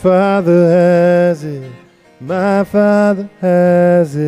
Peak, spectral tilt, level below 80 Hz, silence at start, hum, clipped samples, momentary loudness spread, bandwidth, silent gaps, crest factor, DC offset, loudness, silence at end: -2 dBFS; -8.5 dB/octave; -54 dBFS; 0 s; none; under 0.1%; 10 LU; 11.5 kHz; none; 10 dB; under 0.1%; -12 LUFS; 0 s